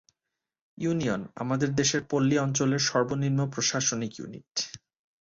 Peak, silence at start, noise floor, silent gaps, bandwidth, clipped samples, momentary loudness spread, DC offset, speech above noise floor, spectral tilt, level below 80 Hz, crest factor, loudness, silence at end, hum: -12 dBFS; 0.8 s; -87 dBFS; 4.51-4.55 s; 7.8 kHz; under 0.1%; 9 LU; under 0.1%; 60 dB; -4 dB/octave; -62 dBFS; 18 dB; -27 LUFS; 0.45 s; none